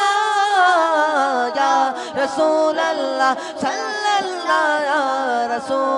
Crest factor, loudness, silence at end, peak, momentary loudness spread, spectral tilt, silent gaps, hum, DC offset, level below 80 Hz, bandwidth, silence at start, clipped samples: 14 dB; -18 LUFS; 0 s; -4 dBFS; 7 LU; -2 dB/octave; none; none; under 0.1%; -72 dBFS; 11 kHz; 0 s; under 0.1%